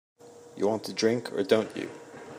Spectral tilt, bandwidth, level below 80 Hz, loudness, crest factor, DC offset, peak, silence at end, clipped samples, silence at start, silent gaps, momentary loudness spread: -4.5 dB/octave; 15.5 kHz; -76 dBFS; -28 LUFS; 22 dB; under 0.1%; -8 dBFS; 0 s; under 0.1%; 0.25 s; none; 15 LU